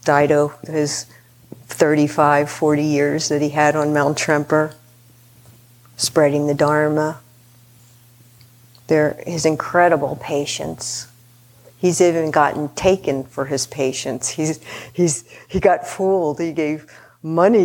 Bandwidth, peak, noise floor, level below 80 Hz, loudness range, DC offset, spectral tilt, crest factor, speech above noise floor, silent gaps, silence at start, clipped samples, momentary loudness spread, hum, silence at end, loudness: 18.5 kHz; 0 dBFS; -49 dBFS; -52 dBFS; 3 LU; under 0.1%; -4.5 dB/octave; 18 dB; 31 dB; none; 0.05 s; under 0.1%; 10 LU; none; 0 s; -18 LUFS